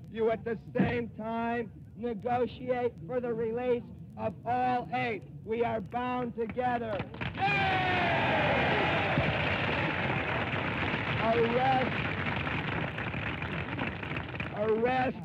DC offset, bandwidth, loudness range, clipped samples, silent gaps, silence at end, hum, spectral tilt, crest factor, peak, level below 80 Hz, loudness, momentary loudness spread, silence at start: under 0.1%; 8.6 kHz; 5 LU; under 0.1%; none; 0 s; none; -7.5 dB/octave; 14 dB; -16 dBFS; -52 dBFS; -31 LUFS; 9 LU; 0 s